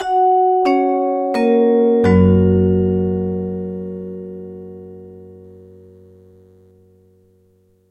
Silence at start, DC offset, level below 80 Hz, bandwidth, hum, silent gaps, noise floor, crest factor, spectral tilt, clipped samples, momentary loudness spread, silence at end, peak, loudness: 0 s; under 0.1%; -48 dBFS; 8.2 kHz; none; none; -56 dBFS; 16 dB; -9.5 dB/octave; under 0.1%; 21 LU; 2.4 s; 0 dBFS; -15 LUFS